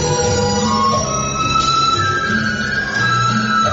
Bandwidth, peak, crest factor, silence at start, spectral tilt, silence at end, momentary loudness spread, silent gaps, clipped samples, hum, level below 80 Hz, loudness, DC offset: 8 kHz; -4 dBFS; 12 dB; 0 s; -3.5 dB/octave; 0 s; 4 LU; none; under 0.1%; none; -38 dBFS; -15 LUFS; under 0.1%